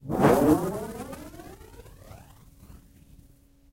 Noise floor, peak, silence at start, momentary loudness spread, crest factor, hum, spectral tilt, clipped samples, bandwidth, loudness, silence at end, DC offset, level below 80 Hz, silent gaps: -57 dBFS; -6 dBFS; 0.05 s; 28 LU; 22 dB; none; -7 dB/octave; under 0.1%; 16 kHz; -24 LUFS; 0.95 s; under 0.1%; -48 dBFS; none